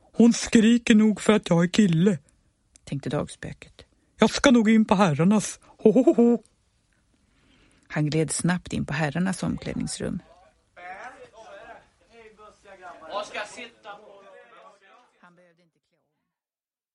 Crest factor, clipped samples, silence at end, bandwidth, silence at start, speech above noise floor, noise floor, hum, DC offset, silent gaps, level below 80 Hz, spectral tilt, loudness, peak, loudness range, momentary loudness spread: 20 dB; under 0.1%; 3 s; 11.5 kHz; 0.2 s; over 68 dB; under -90 dBFS; none; under 0.1%; none; -54 dBFS; -5.5 dB/octave; -22 LUFS; -4 dBFS; 18 LU; 21 LU